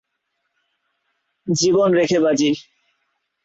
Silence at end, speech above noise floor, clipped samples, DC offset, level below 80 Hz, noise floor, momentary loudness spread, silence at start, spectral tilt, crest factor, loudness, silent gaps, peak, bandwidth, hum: 0.85 s; 58 dB; under 0.1%; under 0.1%; -60 dBFS; -74 dBFS; 10 LU; 1.45 s; -4.5 dB/octave; 16 dB; -18 LUFS; none; -6 dBFS; 8 kHz; none